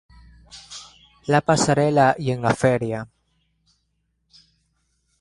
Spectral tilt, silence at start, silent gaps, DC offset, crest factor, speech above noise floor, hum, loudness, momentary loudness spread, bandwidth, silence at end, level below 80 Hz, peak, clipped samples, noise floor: -5.5 dB/octave; 0.55 s; none; under 0.1%; 20 dB; 52 dB; none; -20 LUFS; 21 LU; 11.5 kHz; 2.15 s; -54 dBFS; -4 dBFS; under 0.1%; -71 dBFS